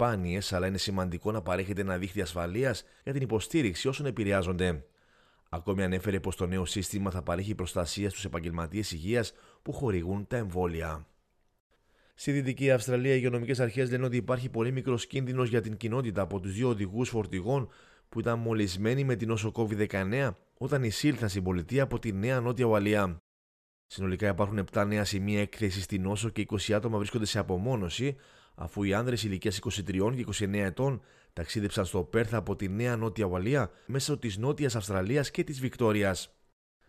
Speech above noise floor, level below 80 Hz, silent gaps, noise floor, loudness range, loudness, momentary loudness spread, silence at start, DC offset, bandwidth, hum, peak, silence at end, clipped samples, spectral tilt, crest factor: 35 dB; -54 dBFS; 11.60-11.70 s, 23.20-23.89 s; -65 dBFS; 3 LU; -31 LUFS; 6 LU; 0 s; under 0.1%; 14.5 kHz; none; -14 dBFS; 0.65 s; under 0.1%; -6 dB/octave; 18 dB